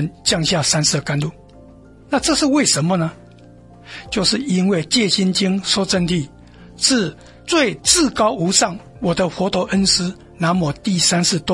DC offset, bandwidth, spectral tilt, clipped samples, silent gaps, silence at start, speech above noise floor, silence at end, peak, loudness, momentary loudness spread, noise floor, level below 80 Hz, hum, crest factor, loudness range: under 0.1%; 11.5 kHz; -3.5 dB/octave; under 0.1%; none; 0 s; 26 dB; 0 s; 0 dBFS; -17 LUFS; 9 LU; -43 dBFS; -44 dBFS; none; 18 dB; 2 LU